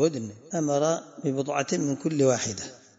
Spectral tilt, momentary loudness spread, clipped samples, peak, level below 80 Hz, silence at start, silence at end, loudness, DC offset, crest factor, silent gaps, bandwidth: -5 dB/octave; 9 LU; under 0.1%; -10 dBFS; -68 dBFS; 0 s; 0.2 s; -27 LUFS; under 0.1%; 16 dB; none; 8 kHz